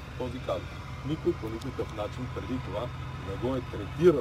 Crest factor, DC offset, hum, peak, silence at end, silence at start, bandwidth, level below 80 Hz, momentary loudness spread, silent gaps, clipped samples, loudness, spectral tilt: 22 dB; under 0.1%; none; -8 dBFS; 0 s; 0 s; 13 kHz; -46 dBFS; 7 LU; none; under 0.1%; -33 LUFS; -7.5 dB/octave